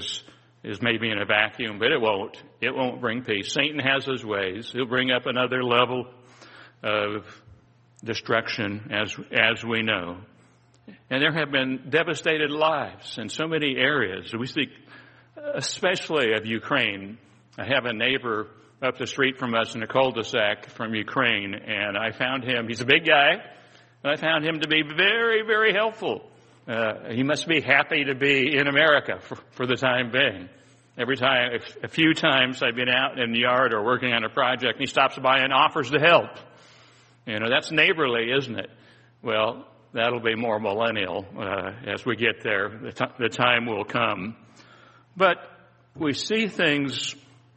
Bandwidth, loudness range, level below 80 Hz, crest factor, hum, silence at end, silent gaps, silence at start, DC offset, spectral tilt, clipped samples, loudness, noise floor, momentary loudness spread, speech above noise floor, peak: 8.4 kHz; 5 LU; -66 dBFS; 24 dB; none; 0.4 s; none; 0 s; under 0.1%; -4 dB/octave; under 0.1%; -23 LUFS; -57 dBFS; 12 LU; 33 dB; -2 dBFS